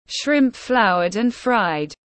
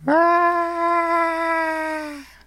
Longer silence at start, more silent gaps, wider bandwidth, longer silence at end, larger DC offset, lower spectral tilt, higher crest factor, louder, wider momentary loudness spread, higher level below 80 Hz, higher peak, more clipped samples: about the same, 0.1 s vs 0 s; neither; second, 8.8 kHz vs 14 kHz; about the same, 0.2 s vs 0.2 s; neither; about the same, -4.5 dB/octave vs -5 dB/octave; about the same, 16 dB vs 14 dB; about the same, -19 LUFS vs -20 LUFS; second, 5 LU vs 10 LU; about the same, -56 dBFS vs -56 dBFS; about the same, -4 dBFS vs -6 dBFS; neither